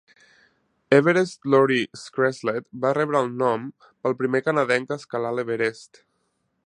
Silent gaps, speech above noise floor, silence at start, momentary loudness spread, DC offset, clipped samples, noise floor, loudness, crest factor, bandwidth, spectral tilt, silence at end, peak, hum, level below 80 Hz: none; 50 dB; 0.9 s; 10 LU; under 0.1%; under 0.1%; -72 dBFS; -23 LUFS; 20 dB; 10.5 kHz; -6 dB/octave; 0.8 s; -2 dBFS; none; -72 dBFS